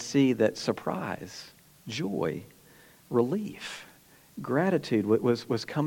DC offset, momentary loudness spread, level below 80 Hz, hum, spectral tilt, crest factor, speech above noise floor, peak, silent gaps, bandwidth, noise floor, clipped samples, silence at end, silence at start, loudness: under 0.1%; 18 LU; -70 dBFS; none; -6 dB/octave; 18 dB; 28 dB; -10 dBFS; none; 17.5 kHz; -56 dBFS; under 0.1%; 0 s; 0 s; -29 LUFS